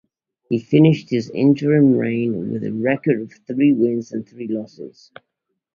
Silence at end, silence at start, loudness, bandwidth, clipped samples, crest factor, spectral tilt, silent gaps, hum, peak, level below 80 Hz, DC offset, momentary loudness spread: 0.85 s; 0.5 s; -19 LUFS; 7 kHz; under 0.1%; 18 dB; -8.5 dB/octave; none; none; -2 dBFS; -60 dBFS; under 0.1%; 14 LU